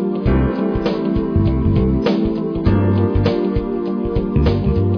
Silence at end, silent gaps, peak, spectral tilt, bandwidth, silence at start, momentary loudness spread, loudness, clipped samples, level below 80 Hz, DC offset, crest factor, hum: 0 s; none; -2 dBFS; -10 dB/octave; 5.4 kHz; 0 s; 4 LU; -18 LUFS; under 0.1%; -24 dBFS; under 0.1%; 14 dB; none